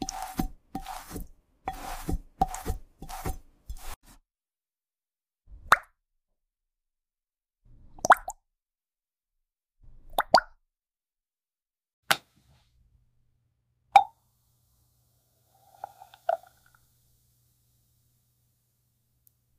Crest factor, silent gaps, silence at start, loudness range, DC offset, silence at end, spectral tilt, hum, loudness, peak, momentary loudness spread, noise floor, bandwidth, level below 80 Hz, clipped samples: 28 dB; 3.96-4.01 s, 11.93-12.03 s; 0 s; 12 LU; under 0.1%; 3.2 s; -3 dB/octave; none; -28 LUFS; -6 dBFS; 24 LU; under -90 dBFS; 15.5 kHz; -46 dBFS; under 0.1%